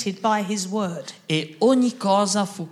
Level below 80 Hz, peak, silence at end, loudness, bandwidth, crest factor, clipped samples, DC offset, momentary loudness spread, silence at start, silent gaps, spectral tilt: -78 dBFS; -6 dBFS; 0 s; -22 LUFS; 14 kHz; 16 dB; under 0.1%; under 0.1%; 8 LU; 0 s; none; -4.5 dB/octave